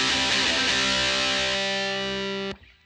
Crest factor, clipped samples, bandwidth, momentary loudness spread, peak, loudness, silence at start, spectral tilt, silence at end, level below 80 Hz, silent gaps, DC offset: 14 dB; under 0.1%; 13 kHz; 9 LU; -10 dBFS; -22 LUFS; 0 s; -1.5 dB/octave; 0.3 s; -50 dBFS; none; under 0.1%